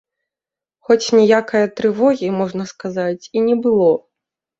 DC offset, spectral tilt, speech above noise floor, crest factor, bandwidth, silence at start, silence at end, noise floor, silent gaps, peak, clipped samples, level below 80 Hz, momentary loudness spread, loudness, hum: under 0.1%; -5.5 dB/octave; 73 dB; 16 dB; 7.8 kHz; 0.9 s; 0.6 s; -89 dBFS; none; -2 dBFS; under 0.1%; -62 dBFS; 10 LU; -17 LUFS; none